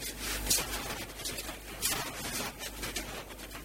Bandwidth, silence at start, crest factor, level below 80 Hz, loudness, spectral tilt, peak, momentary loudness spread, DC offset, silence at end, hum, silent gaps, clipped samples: 17 kHz; 0 s; 24 dB; -48 dBFS; -34 LUFS; -1.5 dB/octave; -14 dBFS; 12 LU; under 0.1%; 0 s; none; none; under 0.1%